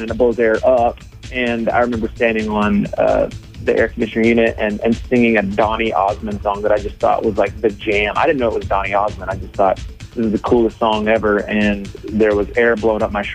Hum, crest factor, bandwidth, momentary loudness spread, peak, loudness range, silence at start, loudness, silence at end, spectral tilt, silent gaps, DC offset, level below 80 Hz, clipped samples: none; 14 dB; 10 kHz; 7 LU; -2 dBFS; 1 LU; 0 s; -17 LUFS; 0 s; -6.5 dB/octave; none; under 0.1%; -34 dBFS; under 0.1%